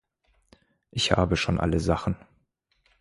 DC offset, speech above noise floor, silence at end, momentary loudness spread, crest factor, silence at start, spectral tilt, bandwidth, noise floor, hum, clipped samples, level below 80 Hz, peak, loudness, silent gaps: under 0.1%; 46 dB; 0.85 s; 11 LU; 24 dB; 0.95 s; -5 dB/octave; 11.5 kHz; -71 dBFS; none; under 0.1%; -40 dBFS; -4 dBFS; -26 LUFS; none